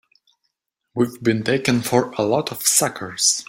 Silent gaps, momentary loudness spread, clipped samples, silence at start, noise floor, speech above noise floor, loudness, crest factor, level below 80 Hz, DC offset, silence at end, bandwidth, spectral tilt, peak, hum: none; 7 LU; under 0.1%; 0.95 s; -75 dBFS; 55 dB; -19 LUFS; 20 dB; -60 dBFS; under 0.1%; 0.05 s; 16.5 kHz; -3 dB/octave; -2 dBFS; none